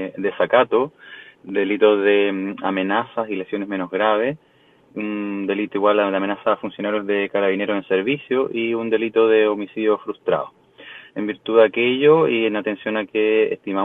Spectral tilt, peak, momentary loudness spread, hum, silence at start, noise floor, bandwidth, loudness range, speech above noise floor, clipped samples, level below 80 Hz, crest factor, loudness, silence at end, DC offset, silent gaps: -8 dB/octave; 0 dBFS; 11 LU; none; 0 s; -54 dBFS; 3.9 kHz; 3 LU; 35 dB; under 0.1%; -66 dBFS; 20 dB; -20 LUFS; 0 s; under 0.1%; none